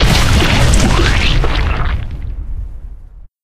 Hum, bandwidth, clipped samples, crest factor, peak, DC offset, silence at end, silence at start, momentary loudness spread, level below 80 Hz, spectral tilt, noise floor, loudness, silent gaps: none; 15.5 kHz; under 0.1%; 12 dB; 0 dBFS; under 0.1%; 0.2 s; 0 s; 17 LU; -16 dBFS; -4.5 dB/octave; -34 dBFS; -13 LUFS; none